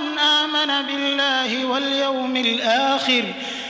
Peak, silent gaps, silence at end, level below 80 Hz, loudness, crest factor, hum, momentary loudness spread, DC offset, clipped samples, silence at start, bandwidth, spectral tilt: -6 dBFS; none; 0 s; -66 dBFS; -19 LUFS; 14 dB; none; 5 LU; under 0.1%; under 0.1%; 0 s; 8 kHz; -2 dB/octave